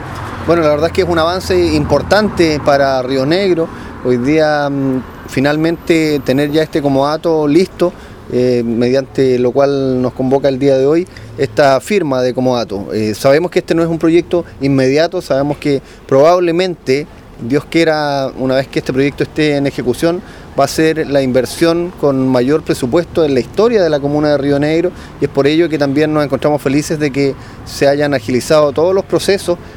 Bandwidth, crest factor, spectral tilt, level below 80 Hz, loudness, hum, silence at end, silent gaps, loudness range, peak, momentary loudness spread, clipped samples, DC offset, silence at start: 19 kHz; 12 dB; -6 dB/octave; -38 dBFS; -13 LUFS; none; 0 s; none; 2 LU; 0 dBFS; 6 LU; under 0.1%; under 0.1%; 0 s